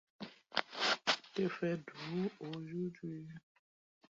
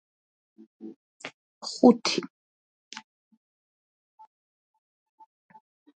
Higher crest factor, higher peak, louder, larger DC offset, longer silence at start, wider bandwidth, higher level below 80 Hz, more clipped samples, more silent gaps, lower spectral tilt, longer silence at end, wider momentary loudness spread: about the same, 26 dB vs 26 dB; second, -14 dBFS vs -4 dBFS; second, -38 LUFS vs -23 LUFS; neither; second, 0.2 s vs 0.85 s; second, 7.6 kHz vs 9.2 kHz; about the same, -80 dBFS vs -78 dBFS; neither; second, none vs 0.96-1.20 s, 1.34-1.61 s; about the same, -3 dB/octave vs -4 dB/octave; second, 0.75 s vs 3.7 s; second, 17 LU vs 27 LU